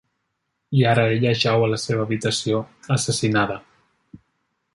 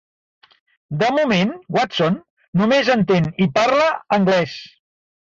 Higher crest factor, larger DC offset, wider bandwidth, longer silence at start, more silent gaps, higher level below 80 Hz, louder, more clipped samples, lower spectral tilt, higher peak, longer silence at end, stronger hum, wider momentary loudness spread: about the same, 18 dB vs 14 dB; neither; first, 11.5 kHz vs 7.6 kHz; second, 0.7 s vs 0.9 s; second, none vs 2.30-2.37 s, 2.48-2.53 s; about the same, -56 dBFS vs -56 dBFS; second, -21 LUFS vs -18 LUFS; neither; about the same, -5 dB/octave vs -6 dB/octave; about the same, -4 dBFS vs -6 dBFS; about the same, 0.6 s vs 0.55 s; neither; about the same, 7 LU vs 9 LU